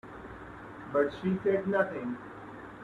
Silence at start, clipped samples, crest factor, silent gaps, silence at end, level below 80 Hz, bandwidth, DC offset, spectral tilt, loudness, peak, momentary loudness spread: 0.05 s; under 0.1%; 20 dB; none; 0 s; -60 dBFS; 7.4 kHz; under 0.1%; -8.5 dB/octave; -31 LUFS; -14 dBFS; 17 LU